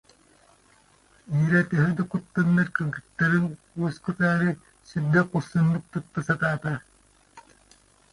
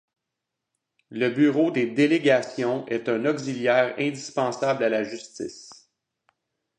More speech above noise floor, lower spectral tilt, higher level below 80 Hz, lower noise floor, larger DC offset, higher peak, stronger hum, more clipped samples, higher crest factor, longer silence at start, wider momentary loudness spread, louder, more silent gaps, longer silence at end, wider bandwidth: second, 35 dB vs 60 dB; first, -8 dB/octave vs -5.5 dB/octave; first, -58 dBFS vs -74 dBFS; second, -59 dBFS vs -84 dBFS; neither; about the same, -8 dBFS vs -6 dBFS; neither; neither; about the same, 18 dB vs 18 dB; first, 1.3 s vs 1.1 s; second, 9 LU vs 14 LU; about the same, -25 LUFS vs -24 LUFS; neither; second, 0.75 s vs 1.05 s; first, 11 kHz vs 9.6 kHz